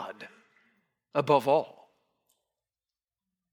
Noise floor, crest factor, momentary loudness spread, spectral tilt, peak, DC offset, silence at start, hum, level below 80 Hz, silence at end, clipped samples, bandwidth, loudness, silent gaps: under -90 dBFS; 22 dB; 23 LU; -6.5 dB/octave; -10 dBFS; under 0.1%; 0 s; none; -86 dBFS; 1.85 s; under 0.1%; 18 kHz; -27 LUFS; none